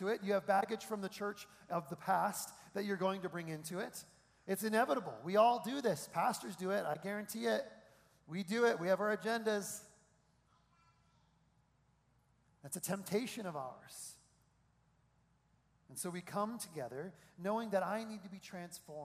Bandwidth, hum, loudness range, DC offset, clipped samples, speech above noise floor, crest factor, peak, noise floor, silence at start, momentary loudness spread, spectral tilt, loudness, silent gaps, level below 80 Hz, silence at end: 15.5 kHz; none; 10 LU; under 0.1%; under 0.1%; 36 dB; 22 dB; -18 dBFS; -74 dBFS; 0 s; 15 LU; -4.5 dB/octave; -38 LUFS; none; -80 dBFS; 0 s